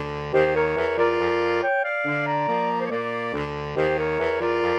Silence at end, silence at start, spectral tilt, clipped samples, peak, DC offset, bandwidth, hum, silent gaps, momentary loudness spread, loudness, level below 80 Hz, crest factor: 0 s; 0 s; -6.5 dB/octave; under 0.1%; -8 dBFS; under 0.1%; 9.4 kHz; none; none; 6 LU; -23 LUFS; -48 dBFS; 16 dB